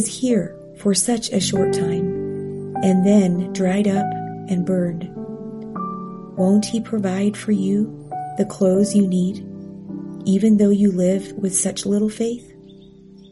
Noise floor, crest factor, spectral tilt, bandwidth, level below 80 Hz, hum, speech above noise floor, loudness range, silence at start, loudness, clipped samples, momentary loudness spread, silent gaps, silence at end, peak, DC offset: -44 dBFS; 16 dB; -6 dB/octave; 11.5 kHz; -56 dBFS; none; 26 dB; 4 LU; 0 s; -20 LUFS; under 0.1%; 16 LU; none; 0.6 s; -4 dBFS; under 0.1%